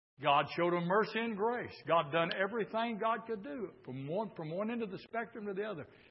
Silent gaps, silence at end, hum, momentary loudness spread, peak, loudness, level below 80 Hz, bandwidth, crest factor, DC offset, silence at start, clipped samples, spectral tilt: none; 0.25 s; none; 11 LU; -16 dBFS; -35 LUFS; -78 dBFS; 5.6 kHz; 20 dB; under 0.1%; 0.2 s; under 0.1%; -3.5 dB/octave